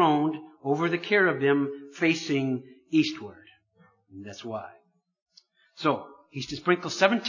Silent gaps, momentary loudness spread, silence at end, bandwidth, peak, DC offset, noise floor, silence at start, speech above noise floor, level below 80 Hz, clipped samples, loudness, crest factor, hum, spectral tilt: 5.22-5.26 s; 18 LU; 0 s; 7.4 kHz; -4 dBFS; under 0.1%; -63 dBFS; 0 s; 37 dB; -70 dBFS; under 0.1%; -27 LUFS; 24 dB; none; -5.5 dB/octave